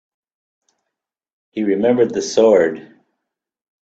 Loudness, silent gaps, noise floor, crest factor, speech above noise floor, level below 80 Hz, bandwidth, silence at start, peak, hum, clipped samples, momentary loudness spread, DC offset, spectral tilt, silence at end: -16 LUFS; none; -81 dBFS; 18 dB; 66 dB; -62 dBFS; 8 kHz; 1.55 s; -2 dBFS; none; under 0.1%; 14 LU; under 0.1%; -5 dB/octave; 1.05 s